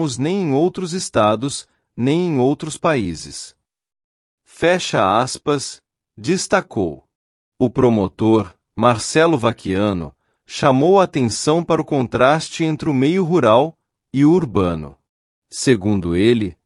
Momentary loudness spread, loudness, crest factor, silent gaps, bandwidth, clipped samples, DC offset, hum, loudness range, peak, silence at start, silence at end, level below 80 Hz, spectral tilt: 12 LU; -17 LUFS; 16 dB; 4.04-4.38 s, 7.15-7.52 s, 15.09-15.42 s; 12 kHz; under 0.1%; under 0.1%; none; 4 LU; -2 dBFS; 0 s; 0.15 s; -50 dBFS; -5.5 dB/octave